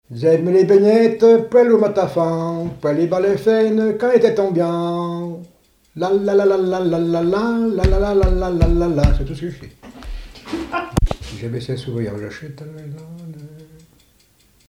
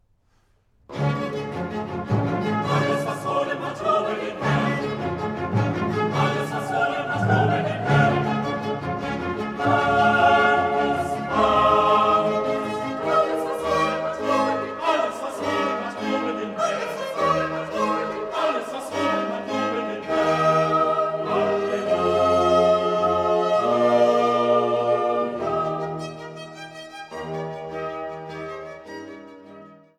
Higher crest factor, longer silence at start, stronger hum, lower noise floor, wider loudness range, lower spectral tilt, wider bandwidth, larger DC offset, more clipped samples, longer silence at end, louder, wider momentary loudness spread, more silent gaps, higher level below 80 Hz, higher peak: about the same, 18 dB vs 18 dB; second, 0.1 s vs 0.9 s; neither; second, -55 dBFS vs -63 dBFS; first, 11 LU vs 6 LU; first, -7.5 dB/octave vs -6 dB/octave; second, 12.5 kHz vs 14 kHz; neither; neither; first, 1.05 s vs 0.25 s; first, -17 LUFS vs -22 LUFS; first, 22 LU vs 13 LU; neither; first, -28 dBFS vs -52 dBFS; first, 0 dBFS vs -6 dBFS